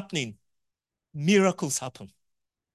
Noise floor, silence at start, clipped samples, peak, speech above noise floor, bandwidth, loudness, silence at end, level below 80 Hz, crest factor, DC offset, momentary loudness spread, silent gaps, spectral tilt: -85 dBFS; 0 s; under 0.1%; -8 dBFS; 59 dB; 12.5 kHz; -26 LUFS; 0.7 s; -70 dBFS; 20 dB; under 0.1%; 17 LU; none; -4.5 dB/octave